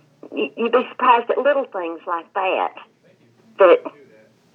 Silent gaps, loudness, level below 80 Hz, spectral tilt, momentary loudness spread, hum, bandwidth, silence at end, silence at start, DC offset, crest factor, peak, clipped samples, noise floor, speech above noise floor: none; -19 LUFS; -90 dBFS; -6 dB/octave; 13 LU; none; 4.3 kHz; 0.65 s; 0.25 s; under 0.1%; 18 dB; -2 dBFS; under 0.1%; -55 dBFS; 36 dB